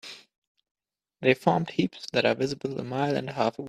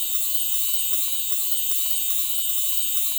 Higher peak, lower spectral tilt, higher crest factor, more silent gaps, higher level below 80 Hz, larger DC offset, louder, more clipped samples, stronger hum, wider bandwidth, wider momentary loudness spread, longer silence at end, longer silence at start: about the same, -6 dBFS vs -8 dBFS; first, -6 dB/octave vs 3.5 dB/octave; first, 22 dB vs 14 dB; first, 0.38-0.55 s, 0.71-0.75 s vs none; about the same, -66 dBFS vs -70 dBFS; neither; second, -27 LUFS vs -19 LUFS; neither; neither; second, 13.5 kHz vs over 20 kHz; first, 7 LU vs 1 LU; about the same, 0 s vs 0 s; about the same, 0.05 s vs 0 s